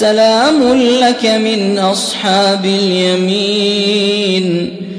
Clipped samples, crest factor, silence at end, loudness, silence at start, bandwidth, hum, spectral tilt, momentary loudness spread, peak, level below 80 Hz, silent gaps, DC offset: under 0.1%; 12 dB; 0 s; -12 LUFS; 0 s; 11 kHz; none; -4.5 dB/octave; 4 LU; 0 dBFS; -52 dBFS; none; under 0.1%